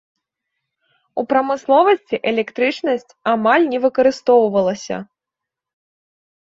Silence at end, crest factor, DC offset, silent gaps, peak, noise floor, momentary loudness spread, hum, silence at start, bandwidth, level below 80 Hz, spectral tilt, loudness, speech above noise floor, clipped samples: 1.55 s; 16 dB; under 0.1%; none; -2 dBFS; -85 dBFS; 12 LU; none; 1.15 s; 7.8 kHz; -64 dBFS; -5 dB/octave; -17 LUFS; 68 dB; under 0.1%